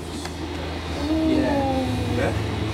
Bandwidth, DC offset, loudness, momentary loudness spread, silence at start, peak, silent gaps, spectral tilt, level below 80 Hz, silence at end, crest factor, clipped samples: 15.5 kHz; under 0.1%; -24 LUFS; 10 LU; 0 s; -10 dBFS; none; -6.5 dB/octave; -36 dBFS; 0 s; 14 dB; under 0.1%